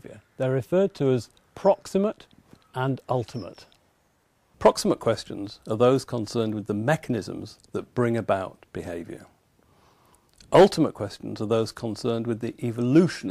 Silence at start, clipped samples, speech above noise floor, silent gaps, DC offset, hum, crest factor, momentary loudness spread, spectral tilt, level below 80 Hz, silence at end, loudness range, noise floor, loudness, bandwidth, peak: 0.05 s; under 0.1%; 42 dB; none; under 0.1%; none; 18 dB; 16 LU; -6.5 dB/octave; -58 dBFS; 0 s; 4 LU; -66 dBFS; -25 LUFS; 15 kHz; -6 dBFS